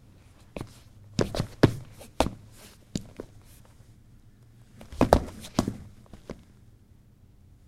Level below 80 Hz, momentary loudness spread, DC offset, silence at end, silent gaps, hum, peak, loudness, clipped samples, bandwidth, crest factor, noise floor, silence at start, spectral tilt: -42 dBFS; 24 LU; under 0.1%; 1.35 s; none; none; 0 dBFS; -28 LUFS; under 0.1%; 16 kHz; 32 dB; -56 dBFS; 0.55 s; -6 dB/octave